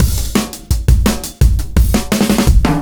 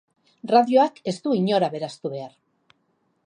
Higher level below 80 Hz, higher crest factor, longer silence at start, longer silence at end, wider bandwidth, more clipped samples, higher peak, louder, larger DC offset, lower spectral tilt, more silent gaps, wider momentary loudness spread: first, -14 dBFS vs -78 dBFS; second, 12 dB vs 20 dB; second, 0 s vs 0.45 s; second, 0 s vs 0.95 s; first, over 20 kHz vs 10.5 kHz; neither; first, 0 dBFS vs -4 dBFS; first, -15 LUFS vs -22 LUFS; neither; about the same, -5.5 dB/octave vs -6.5 dB/octave; neither; second, 6 LU vs 18 LU